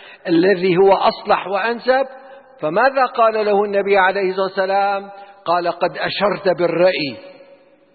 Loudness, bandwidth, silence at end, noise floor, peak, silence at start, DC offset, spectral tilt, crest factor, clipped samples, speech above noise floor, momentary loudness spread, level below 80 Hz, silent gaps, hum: -17 LUFS; 4.8 kHz; 0.6 s; -49 dBFS; -2 dBFS; 0 s; under 0.1%; -10.5 dB/octave; 14 dB; under 0.1%; 32 dB; 9 LU; -58 dBFS; none; none